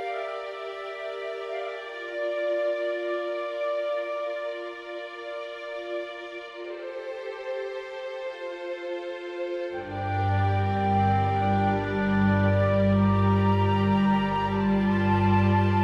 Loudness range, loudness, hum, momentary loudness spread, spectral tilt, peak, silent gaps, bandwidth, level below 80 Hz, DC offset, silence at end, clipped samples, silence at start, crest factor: 12 LU; -27 LUFS; none; 13 LU; -8.5 dB/octave; -12 dBFS; none; 6.8 kHz; -50 dBFS; under 0.1%; 0 s; under 0.1%; 0 s; 14 dB